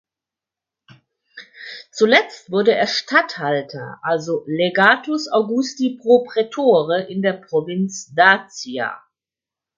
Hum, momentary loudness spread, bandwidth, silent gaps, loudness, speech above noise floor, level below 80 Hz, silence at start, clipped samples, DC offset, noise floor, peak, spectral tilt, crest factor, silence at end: none; 13 LU; 7.6 kHz; none; -18 LUFS; 71 dB; -70 dBFS; 1.35 s; under 0.1%; under 0.1%; -89 dBFS; 0 dBFS; -4.5 dB/octave; 20 dB; 0.8 s